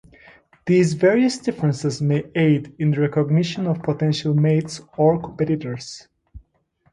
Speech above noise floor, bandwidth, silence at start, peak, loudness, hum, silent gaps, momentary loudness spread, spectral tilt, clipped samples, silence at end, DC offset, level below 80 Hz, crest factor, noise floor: 44 dB; 10.5 kHz; 0.65 s; -4 dBFS; -20 LUFS; none; none; 11 LU; -7 dB/octave; under 0.1%; 0.55 s; under 0.1%; -54 dBFS; 16 dB; -64 dBFS